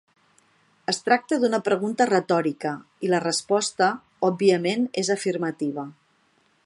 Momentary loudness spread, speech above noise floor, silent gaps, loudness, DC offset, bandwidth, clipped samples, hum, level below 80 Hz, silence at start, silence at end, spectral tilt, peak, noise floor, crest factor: 9 LU; 41 dB; none; -24 LUFS; under 0.1%; 11.5 kHz; under 0.1%; none; -74 dBFS; 0.9 s; 0.75 s; -4 dB/octave; -4 dBFS; -64 dBFS; 20 dB